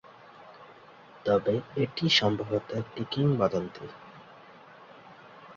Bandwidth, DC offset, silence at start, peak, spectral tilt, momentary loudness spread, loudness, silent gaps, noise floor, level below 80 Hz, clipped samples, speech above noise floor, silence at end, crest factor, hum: 7.6 kHz; under 0.1%; 0.05 s; -10 dBFS; -5.5 dB/octave; 27 LU; -28 LUFS; none; -52 dBFS; -62 dBFS; under 0.1%; 24 dB; 0.05 s; 20 dB; none